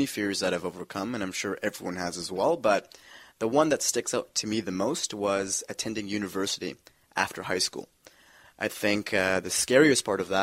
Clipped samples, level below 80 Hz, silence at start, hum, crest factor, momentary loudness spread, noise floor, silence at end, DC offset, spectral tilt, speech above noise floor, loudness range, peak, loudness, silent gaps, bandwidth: under 0.1%; -64 dBFS; 0 s; none; 22 dB; 10 LU; -57 dBFS; 0 s; under 0.1%; -3 dB/octave; 29 dB; 5 LU; -6 dBFS; -28 LUFS; none; 16 kHz